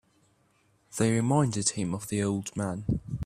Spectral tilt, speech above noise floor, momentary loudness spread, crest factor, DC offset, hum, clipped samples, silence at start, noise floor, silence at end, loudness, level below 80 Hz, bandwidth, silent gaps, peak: -5.5 dB/octave; 40 dB; 8 LU; 18 dB; under 0.1%; none; under 0.1%; 0.9 s; -67 dBFS; 0 s; -28 LUFS; -52 dBFS; 15 kHz; none; -10 dBFS